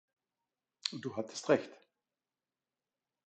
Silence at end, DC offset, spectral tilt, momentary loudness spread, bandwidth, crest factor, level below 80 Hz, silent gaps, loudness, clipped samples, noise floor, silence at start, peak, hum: 1.5 s; under 0.1%; -4 dB/octave; 9 LU; 9 kHz; 28 dB; -84 dBFS; none; -36 LUFS; under 0.1%; under -90 dBFS; 0.85 s; -14 dBFS; none